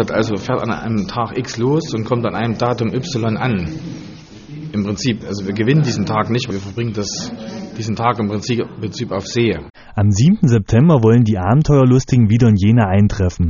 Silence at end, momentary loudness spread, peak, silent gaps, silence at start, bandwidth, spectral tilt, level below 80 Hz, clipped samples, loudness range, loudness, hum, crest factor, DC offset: 0 s; 13 LU; 0 dBFS; none; 0 s; 7.4 kHz; -7 dB/octave; -38 dBFS; under 0.1%; 8 LU; -16 LUFS; none; 16 dB; under 0.1%